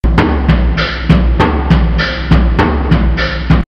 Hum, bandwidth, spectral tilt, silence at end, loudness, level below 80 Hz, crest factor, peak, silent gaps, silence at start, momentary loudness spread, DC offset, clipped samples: none; 6.4 kHz; -8 dB/octave; 0.05 s; -12 LUFS; -14 dBFS; 10 dB; 0 dBFS; none; 0.05 s; 4 LU; under 0.1%; 0.4%